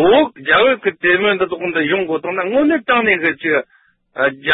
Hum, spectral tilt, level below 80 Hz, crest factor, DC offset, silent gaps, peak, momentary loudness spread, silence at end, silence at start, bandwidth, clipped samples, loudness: none; -10 dB/octave; -52 dBFS; 14 dB; under 0.1%; none; -2 dBFS; 7 LU; 0 s; 0 s; 4.1 kHz; under 0.1%; -15 LUFS